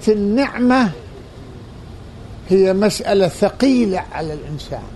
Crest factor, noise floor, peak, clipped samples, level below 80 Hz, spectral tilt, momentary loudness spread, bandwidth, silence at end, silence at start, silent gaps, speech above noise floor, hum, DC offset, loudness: 16 dB; -35 dBFS; -2 dBFS; under 0.1%; -40 dBFS; -6 dB/octave; 22 LU; 12 kHz; 0 s; 0 s; none; 19 dB; none; under 0.1%; -17 LUFS